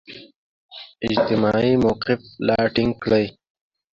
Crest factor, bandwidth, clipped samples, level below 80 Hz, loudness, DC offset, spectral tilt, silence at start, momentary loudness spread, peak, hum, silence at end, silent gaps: 16 dB; 7.4 kHz; under 0.1%; -48 dBFS; -20 LUFS; under 0.1%; -7.5 dB/octave; 0.1 s; 21 LU; -4 dBFS; none; 0.65 s; 0.36-0.69 s